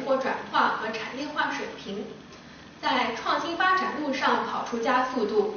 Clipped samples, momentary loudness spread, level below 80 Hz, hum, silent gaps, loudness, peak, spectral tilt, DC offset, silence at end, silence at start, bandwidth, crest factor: under 0.1%; 13 LU; -64 dBFS; none; none; -27 LUFS; -10 dBFS; -1 dB/octave; under 0.1%; 0 s; 0 s; 6.6 kHz; 18 dB